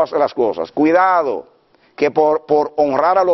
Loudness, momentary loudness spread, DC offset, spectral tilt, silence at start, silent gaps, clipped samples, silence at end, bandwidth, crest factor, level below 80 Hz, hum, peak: -16 LUFS; 6 LU; under 0.1%; -4 dB/octave; 0 s; none; under 0.1%; 0 s; 6 kHz; 14 dB; -58 dBFS; none; -2 dBFS